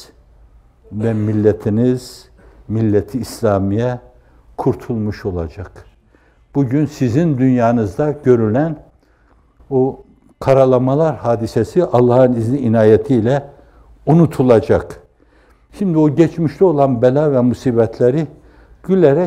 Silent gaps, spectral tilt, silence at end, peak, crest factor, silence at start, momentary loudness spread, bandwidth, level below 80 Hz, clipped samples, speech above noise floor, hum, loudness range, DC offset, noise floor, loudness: none; -8.5 dB/octave; 0 s; 0 dBFS; 16 dB; 0 s; 12 LU; 15 kHz; -44 dBFS; under 0.1%; 38 dB; none; 6 LU; under 0.1%; -52 dBFS; -15 LUFS